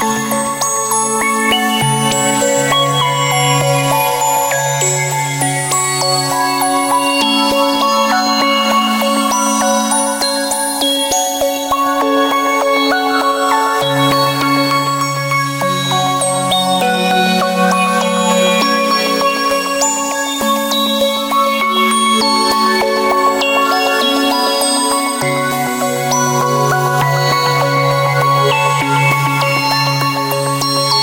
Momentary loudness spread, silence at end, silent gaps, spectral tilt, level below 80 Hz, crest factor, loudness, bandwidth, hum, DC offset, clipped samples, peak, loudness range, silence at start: 3 LU; 0 s; none; -3 dB/octave; -50 dBFS; 12 dB; -13 LUFS; 17 kHz; none; under 0.1%; under 0.1%; -2 dBFS; 1 LU; 0 s